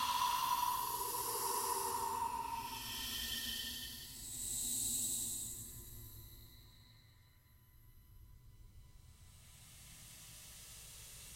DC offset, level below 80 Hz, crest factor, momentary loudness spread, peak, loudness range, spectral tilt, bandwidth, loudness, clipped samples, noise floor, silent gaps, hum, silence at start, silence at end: under 0.1%; -62 dBFS; 18 dB; 21 LU; -24 dBFS; 21 LU; -1 dB/octave; 16 kHz; -39 LUFS; under 0.1%; -66 dBFS; none; none; 0 s; 0 s